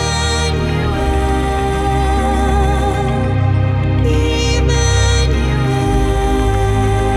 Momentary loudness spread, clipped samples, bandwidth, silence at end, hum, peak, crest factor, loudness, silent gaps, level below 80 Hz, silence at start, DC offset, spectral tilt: 3 LU; under 0.1%; 12.5 kHz; 0 s; none; -2 dBFS; 12 dB; -15 LUFS; none; -18 dBFS; 0 s; under 0.1%; -5.5 dB/octave